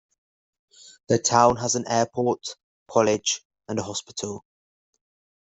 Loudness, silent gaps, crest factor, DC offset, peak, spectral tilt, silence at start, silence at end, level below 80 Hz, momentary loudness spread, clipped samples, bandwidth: -24 LUFS; 2.63-2.86 s, 3.45-3.50 s; 24 dB; under 0.1%; -2 dBFS; -3.5 dB/octave; 1.1 s; 1.15 s; -60 dBFS; 14 LU; under 0.1%; 8.2 kHz